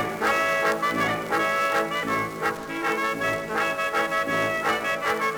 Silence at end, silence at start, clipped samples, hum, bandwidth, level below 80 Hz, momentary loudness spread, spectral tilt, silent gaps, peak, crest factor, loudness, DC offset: 0 s; 0 s; under 0.1%; none; over 20 kHz; -58 dBFS; 4 LU; -3.5 dB/octave; none; -10 dBFS; 14 dB; -24 LUFS; under 0.1%